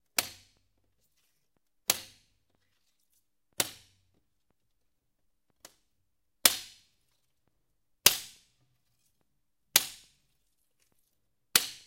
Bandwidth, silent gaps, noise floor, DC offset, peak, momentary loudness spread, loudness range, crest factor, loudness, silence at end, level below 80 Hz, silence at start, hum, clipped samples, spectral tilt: 16 kHz; none; -82 dBFS; under 0.1%; -2 dBFS; 17 LU; 11 LU; 34 dB; -28 LUFS; 0.1 s; -70 dBFS; 0.2 s; none; under 0.1%; 1 dB/octave